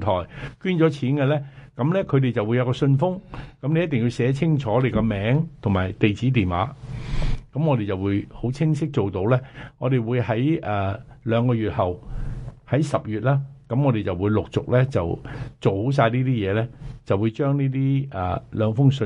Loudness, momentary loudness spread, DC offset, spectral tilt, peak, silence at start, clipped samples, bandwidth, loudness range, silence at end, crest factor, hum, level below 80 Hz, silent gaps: -23 LUFS; 9 LU; under 0.1%; -8.5 dB/octave; -4 dBFS; 0 s; under 0.1%; 9.4 kHz; 2 LU; 0 s; 18 dB; none; -40 dBFS; none